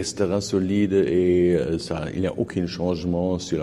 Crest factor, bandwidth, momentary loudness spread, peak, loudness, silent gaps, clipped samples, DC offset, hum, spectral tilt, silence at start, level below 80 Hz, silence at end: 14 dB; 12 kHz; 7 LU; -8 dBFS; -23 LUFS; none; under 0.1%; under 0.1%; none; -6.5 dB/octave; 0 s; -46 dBFS; 0 s